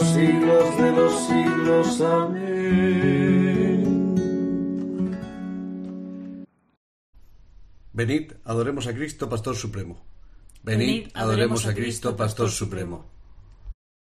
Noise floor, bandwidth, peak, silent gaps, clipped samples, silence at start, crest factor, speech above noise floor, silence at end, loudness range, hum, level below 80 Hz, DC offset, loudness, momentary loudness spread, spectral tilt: -47 dBFS; 13 kHz; -8 dBFS; 6.77-7.13 s; under 0.1%; 0 s; 16 dB; 25 dB; 0.3 s; 12 LU; none; -48 dBFS; under 0.1%; -23 LUFS; 16 LU; -6 dB/octave